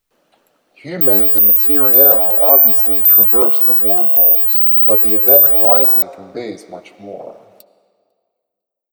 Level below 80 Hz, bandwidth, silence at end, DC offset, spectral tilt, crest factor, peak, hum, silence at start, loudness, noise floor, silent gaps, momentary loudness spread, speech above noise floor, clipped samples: -70 dBFS; over 20 kHz; 1.6 s; under 0.1%; -5 dB/octave; 12 dB; 0 dBFS; none; 0.85 s; -7 LUFS; -80 dBFS; none; 5 LU; 69 dB; under 0.1%